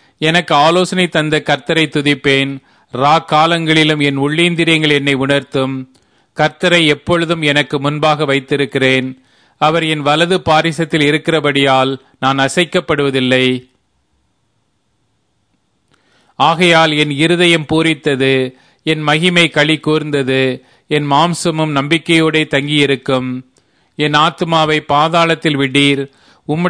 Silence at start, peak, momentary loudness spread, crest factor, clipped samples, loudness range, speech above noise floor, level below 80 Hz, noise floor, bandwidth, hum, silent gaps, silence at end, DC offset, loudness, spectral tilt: 0.2 s; 0 dBFS; 8 LU; 14 dB; under 0.1%; 4 LU; 50 dB; -50 dBFS; -63 dBFS; 11 kHz; none; none; 0 s; 0.1%; -13 LUFS; -5 dB/octave